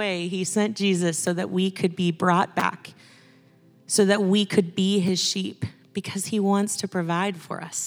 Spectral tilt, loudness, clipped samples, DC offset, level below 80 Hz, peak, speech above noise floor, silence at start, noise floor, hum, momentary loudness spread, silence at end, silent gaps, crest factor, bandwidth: -4.5 dB/octave; -24 LUFS; under 0.1%; under 0.1%; -72 dBFS; -4 dBFS; 32 dB; 0 s; -56 dBFS; none; 11 LU; 0 s; none; 20 dB; over 20 kHz